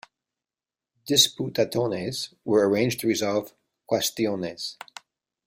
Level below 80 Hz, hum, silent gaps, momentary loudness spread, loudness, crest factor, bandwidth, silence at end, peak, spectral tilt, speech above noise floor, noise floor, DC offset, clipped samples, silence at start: -64 dBFS; none; none; 15 LU; -24 LUFS; 22 dB; 16 kHz; 0.75 s; -6 dBFS; -3.5 dB/octave; over 65 dB; under -90 dBFS; under 0.1%; under 0.1%; 1.05 s